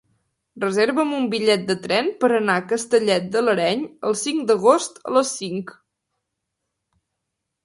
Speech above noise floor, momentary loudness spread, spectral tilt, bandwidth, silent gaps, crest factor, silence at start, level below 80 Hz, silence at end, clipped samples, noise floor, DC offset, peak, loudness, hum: 60 dB; 7 LU; -4 dB/octave; 11.5 kHz; none; 20 dB; 0.55 s; -68 dBFS; 1.95 s; under 0.1%; -80 dBFS; under 0.1%; 0 dBFS; -20 LUFS; none